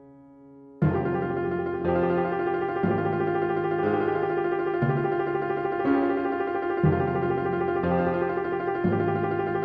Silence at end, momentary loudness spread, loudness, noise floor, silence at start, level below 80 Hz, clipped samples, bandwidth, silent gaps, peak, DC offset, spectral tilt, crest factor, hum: 0 s; 3 LU; -26 LUFS; -50 dBFS; 0 s; -52 dBFS; under 0.1%; 5 kHz; none; -10 dBFS; under 0.1%; -10.5 dB/octave; 16 dB; none